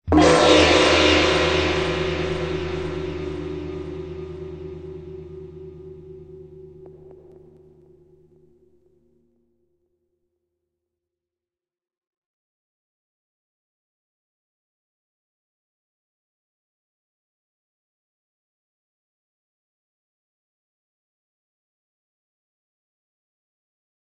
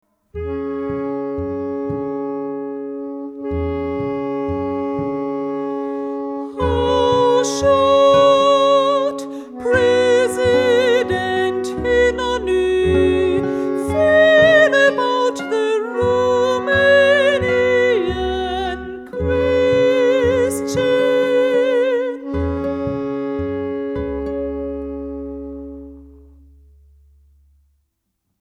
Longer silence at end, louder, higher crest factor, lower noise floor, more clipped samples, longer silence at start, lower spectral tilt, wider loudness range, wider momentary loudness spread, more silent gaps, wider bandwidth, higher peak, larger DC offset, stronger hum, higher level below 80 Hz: first, 17 s vs 2.3 s; about the same, -19 LUFS vs -17 LUFS; first, 24 dB vs 16 dB; first, under -90 dBFS vs -72 dBFS; neither; second, 0.05 s vs 0.35 s; about the same, -4.5 dB/octave vs -5 dB/octave; first, 26 LU vs 10 LU; first, 27 LU vs 14 LU; neither; second, 9.2 kHz vs 13.5 kHz; about the same, -2 dBFS vs -2 dBFS; neither; neither; second, -44 dBFS vs -38 dBFS